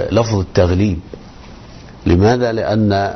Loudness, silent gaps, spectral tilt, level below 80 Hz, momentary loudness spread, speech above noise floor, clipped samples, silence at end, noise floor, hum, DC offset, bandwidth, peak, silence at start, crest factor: -15 LUFS; none; -7 dB/octave; -34 dBFS; 13 LU; 22 dB; under 0.1%; 0 s; -36 dBFS; none; under 0.1%; 6.4 kHz; -2 dBFS; 0 s; 14 dB